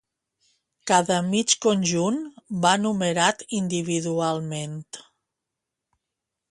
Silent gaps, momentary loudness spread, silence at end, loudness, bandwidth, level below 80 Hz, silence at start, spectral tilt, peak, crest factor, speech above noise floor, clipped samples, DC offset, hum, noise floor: none; 13 LU; 1.5 s; -23 LUFS; 11.5 kHz; -66 dBFS; 0.85 s; -4 dB/octave; -4 dBFS; 22 dB; 61 dB; under 0.1%; under 0.1%; none; -85 dBFS